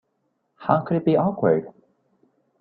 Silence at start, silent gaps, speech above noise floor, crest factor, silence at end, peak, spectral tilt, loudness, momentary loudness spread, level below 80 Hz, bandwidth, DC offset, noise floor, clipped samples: 0.6 s; none; 52 dB; 22 dB; 0.9 s; -4 dBFS; -12 dB/octave; -22 LUFS; 4 LU; -62 dBFS; 4.7 kHz; under 0.1%; -72 dBFS; under 0.1%